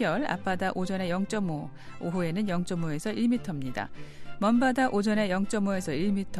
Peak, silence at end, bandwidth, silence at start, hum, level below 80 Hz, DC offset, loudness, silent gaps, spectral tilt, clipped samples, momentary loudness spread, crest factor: -12 dBFS; 0 s; 13 kHz; 0 s; none; -52 dBFS; under 0.1%; -29 LUFS; none; -6 dB/octave; under 0.1%; 12 LU; 16 dB